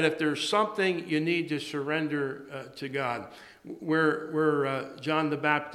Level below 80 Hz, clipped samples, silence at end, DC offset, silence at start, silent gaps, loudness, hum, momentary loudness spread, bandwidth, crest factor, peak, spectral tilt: -74 dBFS; under 0.1%; 0 s; under 0.1%; 0 s; none; -29 LUFS; none; 13 LU; 13 kHz; 20 dB; -10 dBFS; -5 dB/octave